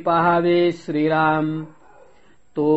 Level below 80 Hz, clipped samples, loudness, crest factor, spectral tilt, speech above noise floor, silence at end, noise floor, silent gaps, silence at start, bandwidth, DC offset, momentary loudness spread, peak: -58 dBFS; under 0.1%; -19 LUFS; 14 dB; -5.5 dB/octave; 37 dB; 0 s; -55 dBFS; none; 0 s; 8 kHz; 0.3%; 14 LU; -6 dBFS